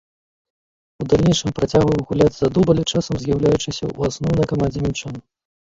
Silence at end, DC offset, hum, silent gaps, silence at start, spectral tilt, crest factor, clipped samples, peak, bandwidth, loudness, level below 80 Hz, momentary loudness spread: 0.4 s; under 0.1%; none; none; 1 s; -6 dB/octave; 18 dB; under 0.1%; -2 dBFS; 7.8 kHz; -19 LUFS; -38 dBFS; 9 LU